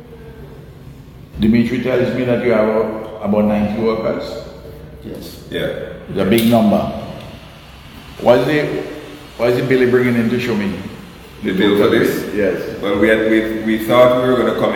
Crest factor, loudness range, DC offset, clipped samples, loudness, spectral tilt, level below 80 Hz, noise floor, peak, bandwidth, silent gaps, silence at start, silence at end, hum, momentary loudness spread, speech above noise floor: 16 dB; 4 LU; under 0.1%; under 0.1%; -16 LUFS; -6.5 dB/octave; -42 dBFS; -37 dBFS; 0 dBFS; 19 kHz; none; 0 s; 0 s; none; 22 LU; 22 dB